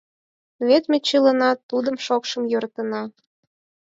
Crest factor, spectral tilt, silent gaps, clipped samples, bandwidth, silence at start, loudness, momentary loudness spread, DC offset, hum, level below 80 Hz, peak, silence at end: 18 dB; -3.5 dB/octave; 1.63-1.69 s; under 0.1%; 7.8 kHz; 0.6 s; -21 LUFS; 10 LU; under 0.1%; none; -74 dBFS; -4 dBFS; 0.75 s